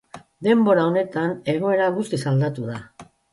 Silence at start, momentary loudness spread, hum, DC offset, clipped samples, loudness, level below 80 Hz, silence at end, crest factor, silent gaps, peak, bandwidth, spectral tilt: 0.15 s; 11 LU; none; under 0.1%; under 0.1%; -21 LUFS; -62 dBFS; 0.3 s; 16 dB; none; -6 dBFS; 11.5 kHz; -7.5 dB/octave